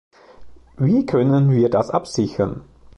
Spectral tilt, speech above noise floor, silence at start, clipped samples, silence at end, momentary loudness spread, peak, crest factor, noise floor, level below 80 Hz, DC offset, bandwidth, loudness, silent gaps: -8 dB/octave; 23 dB; 0.4 s; under 0.1%; 0.35 s; 8 LU; -4 dBFS; 16 dB; -41 dBFS; -48 dBFS; under 0.1%; 10.5 kHz; -19 LUFS; none